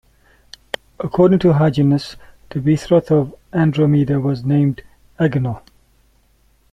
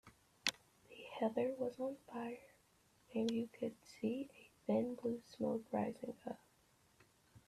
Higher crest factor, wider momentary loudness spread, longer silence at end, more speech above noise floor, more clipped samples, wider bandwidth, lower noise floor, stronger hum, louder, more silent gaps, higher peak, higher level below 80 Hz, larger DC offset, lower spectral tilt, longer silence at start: second, 16 dB vs 26 dB; first, 16 LU vs 13 LU; first, 1.15 s vs 0.1 s; first, 41 dB vs 32 dB; neither; second, 10 kHz vs 14 kHz; second, -56 dBFS vs -73 dBFS; neither; first, -17 LUFS vs -43 LUFS; neither; first, -2 dBFS vs -16 dBFS; first, -46 dBFS vs -80 dBFS; neither; first, -8.5 dB/octave vs -4.5 dB/octave; first, 1 s vs 0.05 s